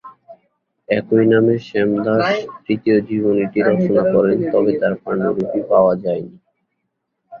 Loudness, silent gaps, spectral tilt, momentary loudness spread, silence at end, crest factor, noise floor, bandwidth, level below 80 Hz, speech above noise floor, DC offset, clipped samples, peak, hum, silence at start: -17 LUFS; none; -8.5 dB/octave; 7 LU; 0.05 s; 16 dB; -74 dBFS; 6.8 kHz; -56 dBFS; 58 dB; under 0.1%; under 0.1%; -2 dBFS; none; 0.05 s